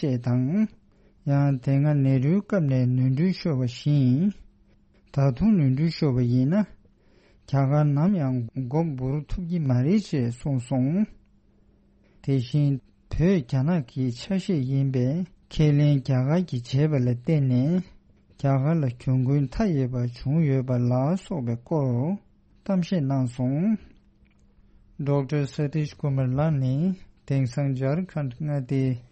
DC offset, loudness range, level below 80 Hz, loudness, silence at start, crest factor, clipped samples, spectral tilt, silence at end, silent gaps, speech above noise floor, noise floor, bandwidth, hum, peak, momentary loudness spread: under 0.1%; 4 LU; -46 dBFS; -25 LUFS; 0 s; 14 dB; under 0.1%; -9 dB/octave; 0.1 s; none; 36 dB; -59 dBFS; 8.4 kHz; none; -10 dBFS; 8 LU